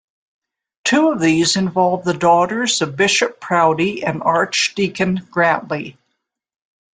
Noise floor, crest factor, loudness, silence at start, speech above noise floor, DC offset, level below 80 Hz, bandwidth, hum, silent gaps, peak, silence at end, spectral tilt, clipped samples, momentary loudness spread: -74 dBFS; 16 dB; -16 LUFS; 0.85 s; 57 dB; under 0.1%; -58 dBFS; 9.6 kHz; none; none; -2 dBFS; 1.05 s; -4 dB/octave; under 0.1%; 6 LU